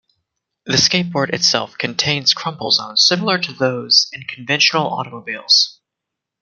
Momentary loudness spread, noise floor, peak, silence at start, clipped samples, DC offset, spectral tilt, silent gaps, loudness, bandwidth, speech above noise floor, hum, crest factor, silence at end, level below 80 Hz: 10 LU; -82 dBFS; 0 dBFS; 0.65 s; under 0.1%; under 0.1%; -2.5 dB/octave; none; -15 LUFS; 12 kHz; 64 dB; none; 18 dB; 0.7 s; -60 dBFS